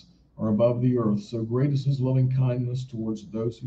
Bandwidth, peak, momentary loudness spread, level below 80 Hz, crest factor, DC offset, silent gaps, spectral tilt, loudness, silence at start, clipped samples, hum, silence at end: 7.6 kHz; -10 dBFS; 9 LU; -58 dBFS; 14 dB; under 0.1%; none; -9.5 dB/octave; -25 LUFS; 0.4 s; under 0.1%; none; 0 s